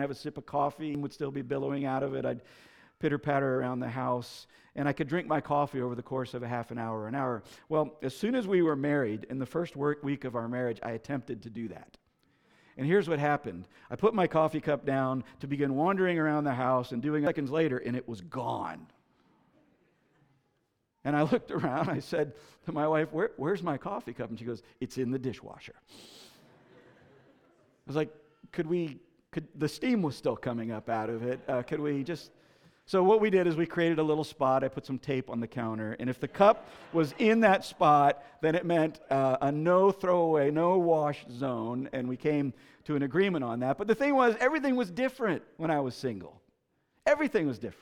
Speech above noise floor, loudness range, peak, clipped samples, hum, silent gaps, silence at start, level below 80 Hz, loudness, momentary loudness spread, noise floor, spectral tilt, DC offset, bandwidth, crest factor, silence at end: 47 dB; 10 LU; -8 dBFS; under 0.1%; none; none; 0 s; -68 dBFS; -30 LUFS; 13 LU; -77 dBFS; -7 dB/octave; under 0.1%; 15.5 kHz; 22 dB; 0.1 s